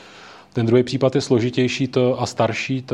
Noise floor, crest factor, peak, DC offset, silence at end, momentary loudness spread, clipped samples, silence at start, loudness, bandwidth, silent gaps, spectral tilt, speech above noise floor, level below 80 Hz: -43 dBFS; 16 dB; -2 dBFS; under 0.1%; 0 s; 5 LU; under 0.1%; 0.05 s; -20 LUFS; 11 kHz; none; -6 dB/octave; 24 dB; -60 dBFS